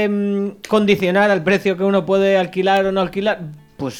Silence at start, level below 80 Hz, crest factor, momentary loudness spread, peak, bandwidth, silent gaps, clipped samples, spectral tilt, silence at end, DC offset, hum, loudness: 0 s; -52 dBFS; 14 dB; 7 LU; -2 dBFS; 15 kHz; none; under 0.1%; -6 dB/octave; 0 s; under 0.1%; none; -17 LUFS